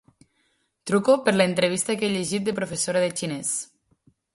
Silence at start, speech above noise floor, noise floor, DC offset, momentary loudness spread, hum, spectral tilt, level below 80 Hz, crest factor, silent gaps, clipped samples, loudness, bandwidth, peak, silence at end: 0.85 s; 47 dB; -70 dBFS; under 0.1%; 8 LU; none; -4 dB/octave; -64 dBFS; 18 dB; none; under 0.1%; -23 LUFS; 12 kHz; -6 dBFS; 0.7 s